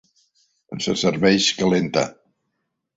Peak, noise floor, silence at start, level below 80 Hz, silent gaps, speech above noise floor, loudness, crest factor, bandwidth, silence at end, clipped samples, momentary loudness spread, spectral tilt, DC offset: -4 dBFS; -76 dBFS; 0.7 s; -56 dBFS; none; 57 dB; -20 LUFS; 18 dB; 8 kHz; 0.85 s; under 0.1%; 12 LU; -4 dB/octave; under 0.1%